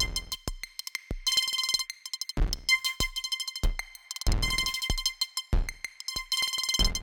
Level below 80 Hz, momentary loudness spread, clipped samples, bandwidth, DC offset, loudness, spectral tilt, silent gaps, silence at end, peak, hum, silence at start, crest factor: -34 dBFS; 12 LU; under 0.1%; 18 kHz; under 0.1%; -29 LUFS; -1.5 dB/octave; none; 0 s; -10 dBFS; none; 0 s; 20 dB